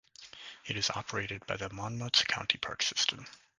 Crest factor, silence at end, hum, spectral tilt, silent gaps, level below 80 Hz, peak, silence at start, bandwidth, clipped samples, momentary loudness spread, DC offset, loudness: 26 dB; 0.25 s; none; -2 dB/octave; none; -62 dBFS; -10 dBFS; 0.2 s; 10.5 kHz; under 0.1%; 19 LU; under 0.1%; -32 LUFS